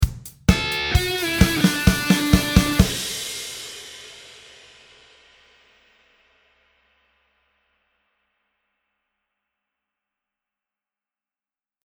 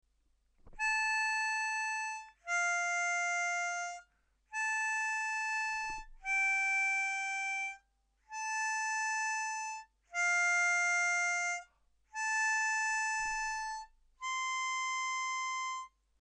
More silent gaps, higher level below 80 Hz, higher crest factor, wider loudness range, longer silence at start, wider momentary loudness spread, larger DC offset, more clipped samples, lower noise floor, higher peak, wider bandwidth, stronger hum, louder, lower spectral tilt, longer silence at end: neither; first, -32 dBFS vs -64 dBFS; first, 24 dB vs 12 dB; first, 20 LU vs 3 LU; second, 0 s vs 0.65 s; first, 20 LU vs 12 LU; neither; neither; first, under -90 dBFS vs -74 dBFS; first, 0 dBFS vs -24 dBFS; first, over 20 kHz vs 13 kHz; neither; first, -20 LUFS vs -33 LUFS; first, -4.5 dB/octave vs 3 dB/octave; first, 7.6 s vs 0.35 s